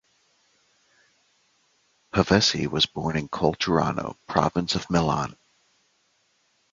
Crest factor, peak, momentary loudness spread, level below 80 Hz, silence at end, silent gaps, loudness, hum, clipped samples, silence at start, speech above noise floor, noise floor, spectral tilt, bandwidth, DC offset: 24 dB; -2 dBFS; 9 LU; -48 dBFS; 1.4 s; none; -24 LUFS; none; under 0.1%; 2.15 s; 44 dB; -68 dBFS; -4.5 dB/octave; 7.6 kHz; under 0.1%